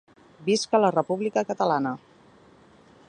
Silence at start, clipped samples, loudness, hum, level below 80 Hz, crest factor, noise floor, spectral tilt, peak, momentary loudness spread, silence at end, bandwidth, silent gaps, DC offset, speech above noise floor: 0.4 s; under 0.1%; -25 LUFS; none; -72 dBFS; 20 dB; -54 dBFS; -5 dB/octave; -6 dBFS; 10 LU; 1.1 s; 11 kHz; none; under 0.1%; 31 dB